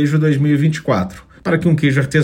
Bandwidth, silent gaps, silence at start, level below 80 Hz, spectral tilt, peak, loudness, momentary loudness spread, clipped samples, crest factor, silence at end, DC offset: 11 kHz; none; 0 s; -46 dBFS; -7.5 dB/octave; -2 dBFS; -16 LUFS; 7 LU; under 0.1%; 12 dB; 0 s; under 0.1%